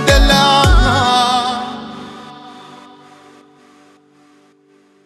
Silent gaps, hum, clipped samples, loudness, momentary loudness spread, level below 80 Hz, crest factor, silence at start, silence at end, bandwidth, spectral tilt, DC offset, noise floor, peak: none; none; under 0.1%; -12 LUFS; 25 LU; -20 dBFS; 16 dB; 0 s; 2.45 s; 14 kHz; -4 dB/octave; under 0.1%; -51 dBFS; 0 dBFS